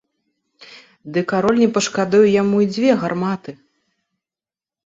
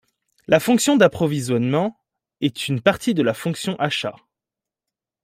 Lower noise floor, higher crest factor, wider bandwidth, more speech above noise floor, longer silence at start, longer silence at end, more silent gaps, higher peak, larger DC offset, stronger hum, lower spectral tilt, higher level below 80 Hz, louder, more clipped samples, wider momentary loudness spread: about the same, under -90 dBFS vs -88 dBFS; about the same, 16 dB vs 20 dB; second, 8 kHz vs 16 kHz; first, over 73 dB vs 69 dB; about the same, 0.6 s vs 0.5 s; first, 1.3 s vs 1.15 s; neither; about the same, -2 dBFS vs -2 dBFS; neither; neither; about the same, -5.5 dB/octave vs -5 dB/octave; about the same, -60 dBFS vs -58 dBFS; first, -17 LUFS vs -20 LUFS; neither; about the same, 10 LU vs 9 LU